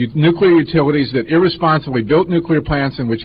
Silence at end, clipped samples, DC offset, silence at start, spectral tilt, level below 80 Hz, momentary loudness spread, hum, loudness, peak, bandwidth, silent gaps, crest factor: 0 s; under 0.1%; 0.2%; 0 s; -11 dB/octave; -38 dBFS; 5 LU; none; -14 LUFS; -2 dBFS; 5.2 kHz; none; 12 dB